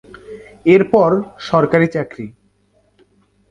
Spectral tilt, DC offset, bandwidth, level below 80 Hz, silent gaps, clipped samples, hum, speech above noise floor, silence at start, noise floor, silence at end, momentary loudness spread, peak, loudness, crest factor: -8 dB/octave; under 0.1%; 7.6 kHz; -54 dBFS; none; under 0.1%; 50 Hz at -45 dBFS; 45 dB; 0.3 s; -59 dBFS; 1.2 s; 24 LU; 0 dBFS; -15 LUFS; 16 dB